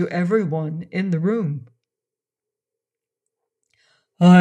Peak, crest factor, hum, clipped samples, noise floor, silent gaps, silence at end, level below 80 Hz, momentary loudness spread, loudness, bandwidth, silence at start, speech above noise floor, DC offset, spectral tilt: -4 dBFS; 18 dB; none; under 0.1%; -88 dBFS; none; 0 s; -68 dBFS; 10 LU; -21 LUFS; 8.6 kHz; 0 s; 67 dB; under 0.1%; -8.5 dB/octave